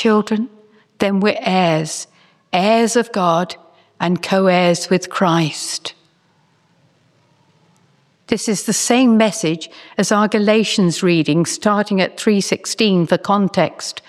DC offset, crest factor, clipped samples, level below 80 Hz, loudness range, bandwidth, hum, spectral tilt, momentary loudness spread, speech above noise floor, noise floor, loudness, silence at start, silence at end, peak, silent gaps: under 0.1%; 16 dB; under 0.1%; -62 dBFS; 7 LU; 14 kHz; none; -4.5 dB/octave; 10 LU; 42 dB; -58 dBFS; -16 LUFS; 0 s; 0.1 s; -2 dBFS; none